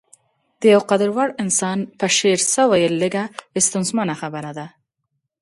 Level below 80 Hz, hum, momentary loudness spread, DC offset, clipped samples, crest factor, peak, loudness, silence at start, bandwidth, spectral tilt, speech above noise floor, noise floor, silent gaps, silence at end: -66 dBFS; none; 13 LU; under 0.1%; under 0.1%; 18 dB; -2 dBFS; -18 LUFS; 0.6 s; 11.5 kHz; -3.5 dB/octave; 57 dB; -75 dBFS; none; 0.75 s